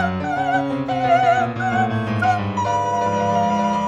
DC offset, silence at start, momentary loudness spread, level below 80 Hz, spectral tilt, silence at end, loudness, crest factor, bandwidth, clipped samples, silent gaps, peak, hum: under 0.1%; 0 s; 5 LU; -52 dBFS; -6 dB/octave; 0 s; -19 LUFS; 14 dB; 9.6 kHz; under 0.1%; none; -4 dBFS; none